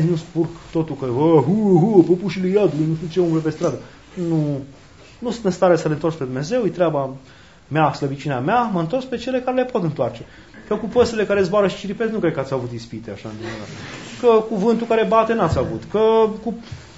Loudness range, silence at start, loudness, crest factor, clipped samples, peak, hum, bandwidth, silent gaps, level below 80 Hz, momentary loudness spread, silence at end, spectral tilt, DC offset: 4 LU; 0 s; -19 LUFS; 20 dB; under 0.1%; 0 dBFS; none; 8 kHz; none; -50 dBFS; 15 LU; 0.1 s; -7.5 dB/octave; 0.2%